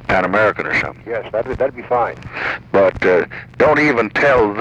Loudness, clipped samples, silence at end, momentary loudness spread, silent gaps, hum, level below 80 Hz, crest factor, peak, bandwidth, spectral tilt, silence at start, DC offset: -16 LUFS; under 0.1%; 0 s; 9 LU; none; none; -42 dBFS; 14 dB; -2 dBFS; 9 kHz; -6.5 dB/octave; 0 s; under 0.1%